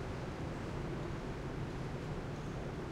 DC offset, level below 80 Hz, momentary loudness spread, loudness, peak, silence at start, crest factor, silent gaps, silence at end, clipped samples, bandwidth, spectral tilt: under 0.1%; -50 dBFS; 1 LU; -42 LUFS; -28 dBFS; 0 s; 12 dB; none; 0 s; under 0.1%; 14 kHz; -7 dB/octave